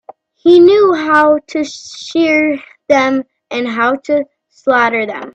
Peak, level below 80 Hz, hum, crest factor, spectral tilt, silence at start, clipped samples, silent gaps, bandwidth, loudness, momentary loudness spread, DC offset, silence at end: 0 dBFS; -56 dBFS; none; 12 dB; -4.5 dB/octave; 0.45 s; under 0.1%; none; 8 kHz; -12 LUFS; 14 LU; under 0.1%; 0.05 s